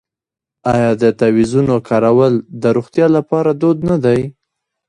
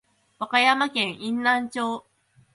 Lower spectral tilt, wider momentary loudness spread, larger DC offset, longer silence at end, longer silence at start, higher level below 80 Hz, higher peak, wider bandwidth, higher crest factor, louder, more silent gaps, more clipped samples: first, -8 dB/octave vs -3 dB/octave; second, 4 LU vs 12 LU; neither; about the same, 0.55 s vs 0.55 s; first, 0.65 s vs 0.4 s; first, -46 dBFS vs -72 dBFS; first, 0 dBFS vs -6 dBFS; about the same, 10.5 kHz vs 11.5 kHz; second, 14 dB vs 20 dB; first, -14 LUFS vs -23 LUFS; neither; neither